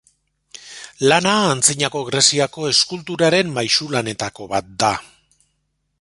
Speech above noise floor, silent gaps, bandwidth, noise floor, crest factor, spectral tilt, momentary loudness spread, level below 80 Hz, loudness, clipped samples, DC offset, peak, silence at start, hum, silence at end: 52 dB; none; 12 kHz; -70 dBFS; 20 dB; -2.5 dB/octave; 12 LU; -56 dBFS; -17 LUFS; under 0.1%; under 0.1%; 0 dBFS; 0.6 s; none; 0.95 s